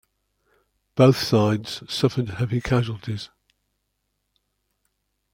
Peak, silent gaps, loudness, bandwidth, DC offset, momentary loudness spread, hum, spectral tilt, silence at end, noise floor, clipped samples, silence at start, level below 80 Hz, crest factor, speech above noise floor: -2 dBFS; none; -22 LUFS; 16.5 kHz; under 0.1%; 15 LU; 50 Hz at -55 dBFS; -6.5 dB/octave; 2.05 s; -75 dBFS; under 0.1%; 0.95 s; -50 dBFS; 22 dB; 54 dB